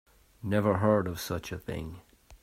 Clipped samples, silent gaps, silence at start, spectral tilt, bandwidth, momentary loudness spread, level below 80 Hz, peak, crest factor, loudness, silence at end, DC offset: under 0.1%; none; 0.45 s; -6.5 dB/octave; 16 kHz; 14 LU; -54 dBFS; -12 dBFS; 20 dB; -30 LUFS; 0.05 s; under 0.1%